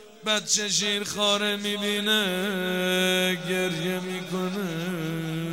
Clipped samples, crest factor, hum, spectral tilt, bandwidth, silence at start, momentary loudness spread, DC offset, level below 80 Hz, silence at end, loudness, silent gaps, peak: under 0.1%; 18 dB; none; -3 dB/octave; 16.5 kHz; 0 s; 7 LU; 0.1%; -70 dBFS; 0 s; -25 LUFS; none; -8 dBFS